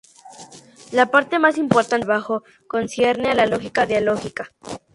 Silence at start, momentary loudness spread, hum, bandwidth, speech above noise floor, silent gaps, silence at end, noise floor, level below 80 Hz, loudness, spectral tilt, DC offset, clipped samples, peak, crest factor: 0.25 s; 15 LU; none; 11.5 kHz; 25 dB; none; 0.15 s; -44 dBFS; -56 dBFS; -19 LUFS; -5 dB/octave; under 0.1%; under 0.1%; 0 dBFS; 20 dB